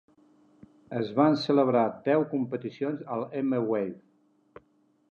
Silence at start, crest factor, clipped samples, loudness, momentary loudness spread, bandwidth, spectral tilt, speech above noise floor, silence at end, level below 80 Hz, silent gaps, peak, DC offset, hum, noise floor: 0.9 s; 20 dB; under 0.1%; -27 LUFS; 10 LU; 7 kHz; -8 dB/octave; 40 dB; 1.1 s; -76 dBFS; none; -8 dBFS; under 0.1%; none; -67 dBFS